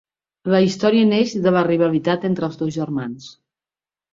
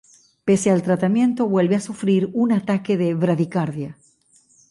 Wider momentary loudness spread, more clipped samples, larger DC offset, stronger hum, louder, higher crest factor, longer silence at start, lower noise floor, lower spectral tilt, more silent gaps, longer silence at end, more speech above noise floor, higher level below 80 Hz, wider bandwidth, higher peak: first, 11 LU vs 7 LU; neither; neither; neither; about the same, -19 LUFS vs -20 LUFS; about the same, 16 dB vs 14 dB; about the same, 0.45 s vs 0.45 s; first, under -90 dBFS vs -57 dBFS; about the same, -6.5 dB/octave vs -7 dB/octave; neither; about the same, 0.85 s vs 0.75 s; first, over 72 dB vs 38 dB; about the same, -60 dBFS vs -62 dBFS; second, 7.6 kHz vs 11.5 kHz; first, -4 dBFS vs -8 dBFS